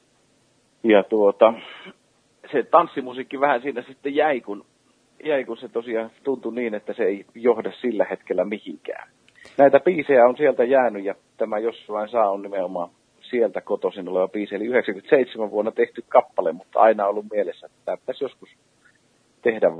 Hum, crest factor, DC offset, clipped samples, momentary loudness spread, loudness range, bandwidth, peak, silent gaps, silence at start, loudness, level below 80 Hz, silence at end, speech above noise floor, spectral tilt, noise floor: none; 22 dB; under 0.1%; under 0.1%; 15 LU; 6 LU; 5.8 kHz; 0 dBFS; none; 0.85 s; -22 LUFS; -76 dBFS; 0 s; 41 dB; -7 dB/octave; -62 dBFS